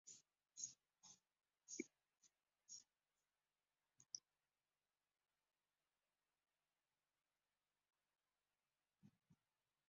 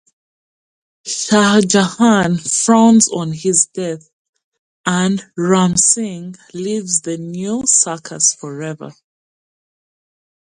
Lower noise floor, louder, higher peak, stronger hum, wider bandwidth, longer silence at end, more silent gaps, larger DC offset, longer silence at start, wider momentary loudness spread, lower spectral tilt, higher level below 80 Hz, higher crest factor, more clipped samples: about the same, under -90 dBFS vs under -90 dBFS; second, -58 LUFS vs -14 LUFS; second, -32 dBFS vs 0 dBFS; first, 50 Hz at -110 dBFS vs none; second, 7.4 kHz vs 11.5 kHz; second, 0.55 s vs 1.55 s; second, none vs 4.13-4.33 s, 4.44-4.52 s, 4.58-4.84 s; neither; second, 0.05 s vs 1.05 s; about the same, 14 LU vs 15 LU; about the same, -2.5 dB/octave vs -3.5 dB/octave; second, under -90 dBFS vs -56 dBFS; first, 34 dB vs 16 dB; neither